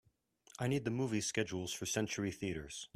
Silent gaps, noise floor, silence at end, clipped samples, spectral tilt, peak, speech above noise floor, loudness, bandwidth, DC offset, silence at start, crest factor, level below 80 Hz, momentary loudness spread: none; -68 dBFS; 0.1 s; under 0.1%; -4.5 dB/octave; -20 dBFS; 30 dB; -38 LUFS; 15.5 kHz; under 0.1%; 0.6 s; 20 dB; -66 dBFS; 6 LU